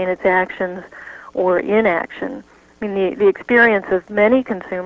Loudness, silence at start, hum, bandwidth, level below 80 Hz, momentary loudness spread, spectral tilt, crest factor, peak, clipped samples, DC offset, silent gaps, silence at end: -17 LUFS; 0 s; none; 7.2 kHz; -54 dBFS; 16 LU; -7.5 dB/octave; 16 dB; -2 dBFS; under 0.1%; under 0.1%; none; 0 s